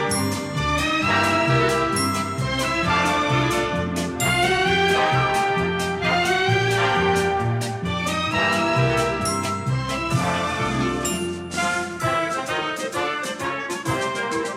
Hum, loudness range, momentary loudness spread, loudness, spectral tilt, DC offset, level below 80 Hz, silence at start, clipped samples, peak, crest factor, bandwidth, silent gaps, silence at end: none; 4 LU; 6 LU; -21 LUFS; -4.5 dB/octave; under 0.1%; -42 dBFS; 0 s; under 0.1%; -8 dBFS; 14 dB; 16.5 kHz; none; 0 s